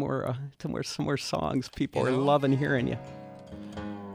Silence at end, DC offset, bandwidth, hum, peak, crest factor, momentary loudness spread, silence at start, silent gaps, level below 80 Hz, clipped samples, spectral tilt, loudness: 0 s; under 0.1%; 14.5 kHz; none; -12 dBFS; 18 dB; 18 LU; 0 s; none; -56 dBFS; under 0.1%; -6 dB/octave; -29 LUFS